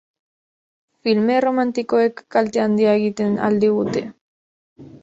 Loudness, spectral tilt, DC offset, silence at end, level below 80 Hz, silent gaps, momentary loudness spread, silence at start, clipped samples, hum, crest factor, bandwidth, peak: -19 LUFS; -6.5 dB/octave; under 0.1%; 0.05 s; -62 dBFS; 4.21-4.76 s; 6 LU; 1.05 s; under 0.1%; none; 16 dB; 7.8 kHz; -4 dBFS